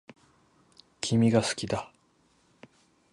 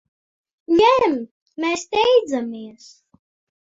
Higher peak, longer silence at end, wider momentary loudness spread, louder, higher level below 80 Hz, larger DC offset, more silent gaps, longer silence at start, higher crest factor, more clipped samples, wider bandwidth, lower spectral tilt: second, -10 dBFS vs -4 dBFS; first, 1.25 s vs 0.9 s; second, 12 LU vs 20 LU; second, -27 LUFS vs -18 LUFS; about the same, -60 dBFS vs -58 dBFS; neither; second, none vs 1.31-1.46 s; first, 1 s vs 0.7 s; about the same, 20 dB vs 18 dB; neither; first, 11.5 kHz vs 7.8 kHz; first, -5.5 dB/octave vs -3.5 dB/octave